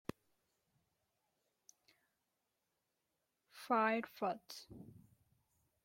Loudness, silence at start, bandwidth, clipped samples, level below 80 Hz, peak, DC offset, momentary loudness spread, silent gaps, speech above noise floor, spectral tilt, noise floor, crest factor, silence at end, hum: -38 LUFS; 3.55 s; 16.5 kHz; under 0.1%; -80 dBFS; -22 dBFS; under 0.1%; 23 LU; none; 48 dB; -5 dB/octave; -87 dBFS; 24 dB; 1 s; none